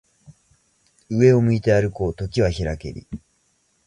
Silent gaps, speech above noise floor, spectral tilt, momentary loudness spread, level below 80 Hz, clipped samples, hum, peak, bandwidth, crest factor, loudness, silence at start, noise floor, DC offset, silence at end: none; 46 dB; -7.5 dB/octave; 20 LU; -40 dBFS; under 0.1%; none; -4 dBFS; 10 kHz; 18 dB; -20 LUFS; 0.3 s; -65 dBFS; under 0.1%; 0.7 s